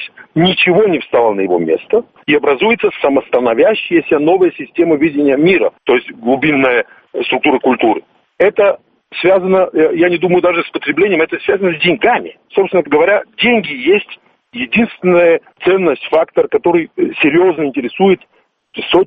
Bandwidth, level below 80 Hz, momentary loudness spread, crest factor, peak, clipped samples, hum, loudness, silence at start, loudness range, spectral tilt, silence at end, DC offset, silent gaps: 4.8 kHz; -52 dBFS; 6 LU; 12 dB; 0 dBFS; under 0.1%; none; -13 LUFS; 0 s; 1 LU; -8.5 dB/octave; 0 s; under 0.1%; none